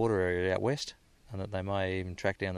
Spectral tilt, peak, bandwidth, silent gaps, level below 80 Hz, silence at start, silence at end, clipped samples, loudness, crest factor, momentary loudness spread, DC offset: -6 dB/octave; -16 dBFS; 14.5 kHz; none; -58 dBFS; 0 s; 0 s; under 0.1%; -33 LUFS; 16 dB; 12 LU; under 0.1%